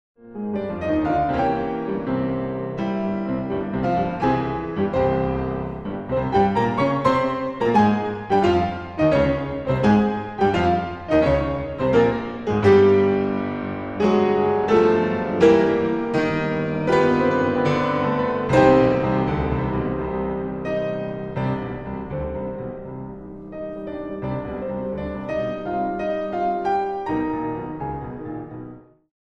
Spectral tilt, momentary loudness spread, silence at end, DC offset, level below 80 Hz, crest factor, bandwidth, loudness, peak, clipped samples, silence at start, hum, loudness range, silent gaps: -8 dB/octave; 13 LU; 0.45 s; under 0.1%; -42 dBFS; 18 dB; 8.6 kHz; -21 LUFS; -2 dBFS; under 0.1%; 0.25 s; none; 9 LU; none